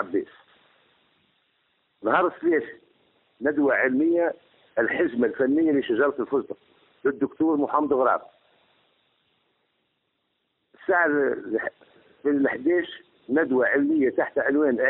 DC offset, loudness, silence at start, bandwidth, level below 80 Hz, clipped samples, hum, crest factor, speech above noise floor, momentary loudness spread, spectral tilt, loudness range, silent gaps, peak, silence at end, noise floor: under 0.1%; -24 LUFS; 0 s; 4 kHz; -68 dBFS; under 0.1%; none; 18 dB; 52 dB; 10 LU; -4 dB/octave; 5 LU; none; -6 dBFS; 0 s; -75 dBFS